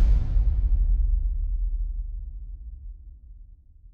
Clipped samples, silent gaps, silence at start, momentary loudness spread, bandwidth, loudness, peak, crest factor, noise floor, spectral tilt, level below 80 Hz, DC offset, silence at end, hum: under 0.1%; none; 0 s; 20 LU; 1.5 kHz; -28 LUFS; -10 dBFS; 14 dB; -49 dBFS; -9.5 dB/octave; -24 dBFS; under 0.1%; 0.05 s; none